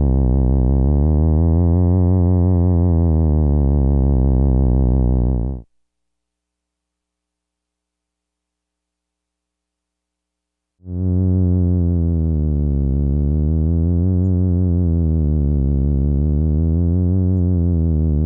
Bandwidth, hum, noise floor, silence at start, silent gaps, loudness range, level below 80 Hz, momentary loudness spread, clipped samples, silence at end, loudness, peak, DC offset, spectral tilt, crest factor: 1.3 kHz; none; -81 dBFS; 0 s; none; 8 LU; -22 dBFS; 3 LU; under 0.1%; 0 s; -17 LUFS; -6 dBFS; under 0.1%; -16 dB/octave; 12 dB